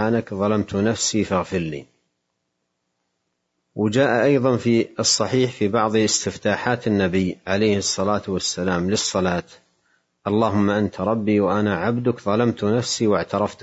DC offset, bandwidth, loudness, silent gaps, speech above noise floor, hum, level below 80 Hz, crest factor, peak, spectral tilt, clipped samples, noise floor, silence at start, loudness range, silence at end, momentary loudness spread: under 0.1%; 8 kHz; -21 LUFS; none; 55 dB; none; -58 dBFS; 16 dB; -4 dBFS; -4.5 dB/octave; under 0.1%; -75 dBFS; 0 s; 5 LU; 0 s; 6 LU